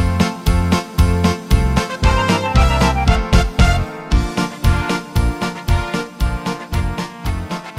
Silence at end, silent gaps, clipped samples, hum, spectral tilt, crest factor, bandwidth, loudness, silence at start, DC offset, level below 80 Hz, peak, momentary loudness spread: 0 s; none; under 0.1%; none; -5.5 dB/octave; 14 dB; 16 kHz; -18 LUFS; 0 s; under 0.1%; -20 dBFS; -2 dBFS; 8 LU